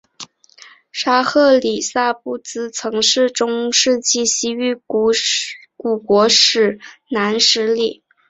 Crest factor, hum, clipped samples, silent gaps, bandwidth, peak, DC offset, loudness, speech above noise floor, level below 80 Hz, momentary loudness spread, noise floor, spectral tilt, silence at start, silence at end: 18 dB; none; under 0.1%; none; 8.2 kHz; 0 dBFS; under 0.1%; -16 LUFS; 29 dB; -60 dBFS; 13 LU; -45 dBFS; -1.5 dB/octave; 0.2 s; 0.35 s